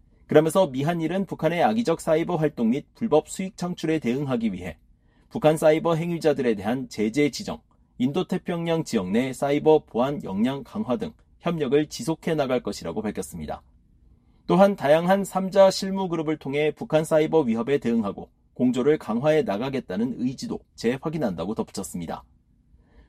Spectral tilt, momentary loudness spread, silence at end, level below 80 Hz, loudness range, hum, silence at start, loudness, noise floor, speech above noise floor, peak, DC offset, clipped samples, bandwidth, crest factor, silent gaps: -6 dB/octave; 13 LU; 0.85 s; -54 dBFS; 5 LU; none; 0.3 s; -24 LUFS; -58 dBFS; 35 dB; -2 dBFS; under 0.1%; under 0.1%; 15 kHz; 22 dB; none